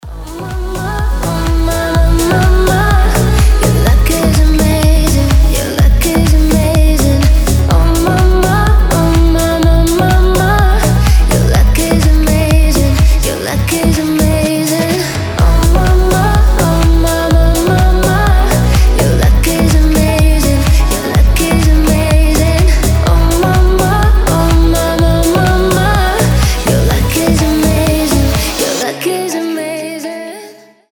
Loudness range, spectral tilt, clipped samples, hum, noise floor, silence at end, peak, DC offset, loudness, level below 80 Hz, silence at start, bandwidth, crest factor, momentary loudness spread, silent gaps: 2 LU; -5.5 dB/octave; under 0.1%; none; -36 dBFS; 0.4 s; 0 dBFS; under 0.1%; -11 LUFS; -12 dBFS; 0.05 s; 19.5 kHz; 8 dB; 5 LU; none